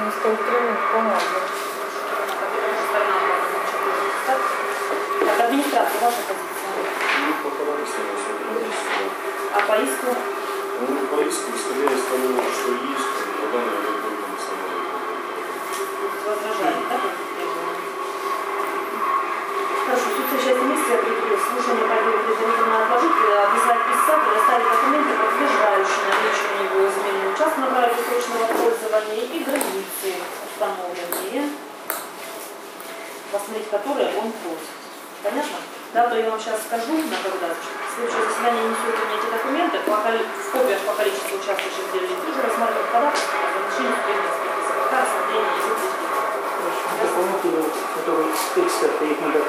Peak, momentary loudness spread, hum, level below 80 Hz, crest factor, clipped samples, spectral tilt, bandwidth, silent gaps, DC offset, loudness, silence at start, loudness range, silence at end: -2 dBFS; 9 LU; none; -82 dBFS; 20 dB; under 0.1%; -2 dB/octave; 16 kHz; none; under 0.1%; -22 LUFS; 0 s; 7 LU; 0 s